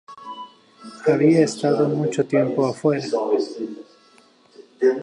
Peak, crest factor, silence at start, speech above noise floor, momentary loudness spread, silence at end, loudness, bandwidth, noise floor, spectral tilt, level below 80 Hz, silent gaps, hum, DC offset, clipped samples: -4 dBFS; 18 dB; 0.1 s; 34 dB; 21 LU; 0 s; -20 LUFS; 11 kHz; -54 dBFS; -6.5 dB/octave; -72 dBFS; none; none; under 0.1%; under 0.1%